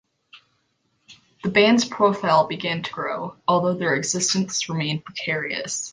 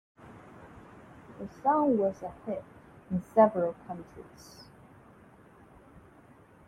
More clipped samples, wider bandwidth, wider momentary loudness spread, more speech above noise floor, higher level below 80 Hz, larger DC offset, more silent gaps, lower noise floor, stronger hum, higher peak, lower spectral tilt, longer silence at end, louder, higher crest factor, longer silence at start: neither; second, 10.5 kHz vs 13 kHz; second, 9 LU vs 27 LU; first, 47 dB vs 28 dB; about the same, -64 dBFS vs -64 dBFS; neither; neither; first, -69 dBFS vs -57 dBFS; neither; first, -4 dBFS vs -10 dBFS; second, -3.5 dB/octave vs -8 dB/octave; second, 0 s vs 0.7 s; first, -22 LUFS vs -29 LUFS; about the same, 20 dB vs 22 dB; about the same, 0.35 s vs 0.25 s